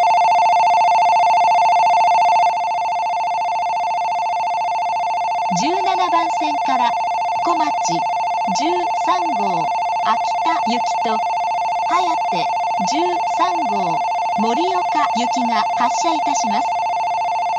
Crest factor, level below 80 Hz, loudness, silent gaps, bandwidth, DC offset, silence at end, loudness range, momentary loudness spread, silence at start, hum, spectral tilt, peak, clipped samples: 12 dB; -60 dBFS; -17 LUFS; none; 8.4 kHz; under 0.1%; 0 s; 3 LU; 6 LU; 0 s; none; -3 dB/octave; -4 dBFS; under 0.1%